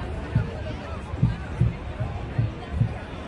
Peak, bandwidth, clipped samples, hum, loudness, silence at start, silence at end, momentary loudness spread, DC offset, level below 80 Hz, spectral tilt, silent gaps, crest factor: -8 dBFS; 9.2 kHz; under 0.1%; none; -28 LUFS; 0 s; 0 s; 7 LU; under 0.1%; -36 dBFS; -8.5 dB/octave; none; 18 dB